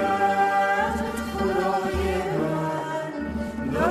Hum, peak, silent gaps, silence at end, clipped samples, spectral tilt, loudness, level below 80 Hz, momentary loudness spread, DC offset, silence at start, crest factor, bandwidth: none; -8 dBFS; none; 0 s; under 0.1%; -6 dB/octave; -25 LUFS; -40 dBFS; 8 LU; under 0.1%; 0 s; 16 dB; 14 kHz